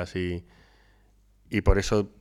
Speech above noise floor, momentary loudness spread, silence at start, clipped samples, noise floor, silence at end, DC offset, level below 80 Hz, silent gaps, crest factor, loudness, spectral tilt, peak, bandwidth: 35 dB; 9 LU; 0 s; under 0.1%; -60 dBFS; 0.15 s; under 0.1%; -32 dBFS; none; 22 dB; -27 LUFS; -6 dB/octave; -6 dBFS; 13.5 kHz